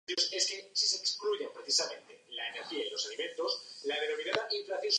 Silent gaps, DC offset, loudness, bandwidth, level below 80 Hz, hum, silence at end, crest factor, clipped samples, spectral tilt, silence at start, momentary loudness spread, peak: none; under 0.1%; -33 LUFS; 11 kHz; -88 dBFS; none; 0 s; 22 dB; under 0.1%; 0.5 dB/octave; 0.1 s; 9 LU; -12 dBFS